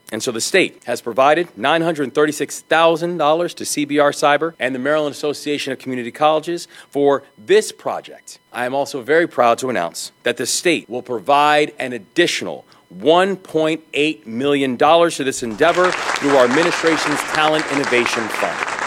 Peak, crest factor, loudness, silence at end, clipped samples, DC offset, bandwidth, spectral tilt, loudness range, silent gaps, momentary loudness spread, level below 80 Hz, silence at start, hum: -2 dBFS; 16 dB; -17 LUFS; 0 s; under 0.1%; under 0.1%; 16.5 kHz; -3.5 dB/octave; 4 LU; none; 10 LU; -60 dBFS; 0.1 s; none